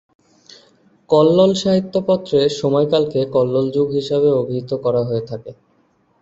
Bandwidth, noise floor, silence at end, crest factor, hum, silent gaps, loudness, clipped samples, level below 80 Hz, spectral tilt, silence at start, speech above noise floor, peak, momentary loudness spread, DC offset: 8 kHz; -59 dBFS; 0.7 s; 16 dB; none; none; -17 LUFS; under 0.1%; -56 dBFS; -7 dB/octave; 1.1 s; 43 dB; -2 dBFS; 8 LU; under 0.1%